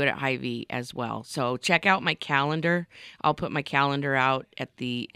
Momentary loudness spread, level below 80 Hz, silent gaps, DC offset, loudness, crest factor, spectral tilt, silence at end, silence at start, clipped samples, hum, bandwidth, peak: 10 LU; -64 dBFS; none; under 0.1%; -26 LUFS; 20 dB; -5 dB/octave; 0.1 s; 0 s; under 0.1%; none; 14.5 kHz; -6 dBFS